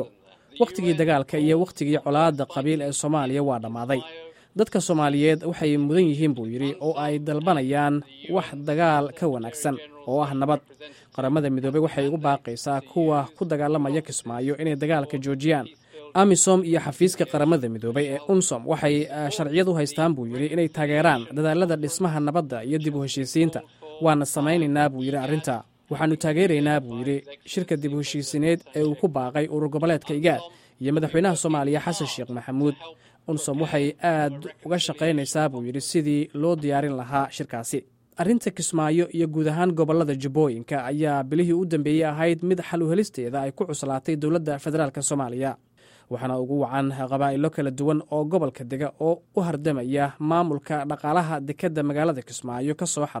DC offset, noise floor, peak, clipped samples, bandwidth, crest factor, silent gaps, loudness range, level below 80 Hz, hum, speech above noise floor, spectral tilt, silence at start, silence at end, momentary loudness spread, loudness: under 0.1%; -52 dBFS; -6 dBFS; under 0.1%; 16 kHz; 18 dB; none; 3 LU; -64 dBFS; none; 29 dB; -5.5 dB/octave; 0 s; 0 s; 7 LU; -24 LUFS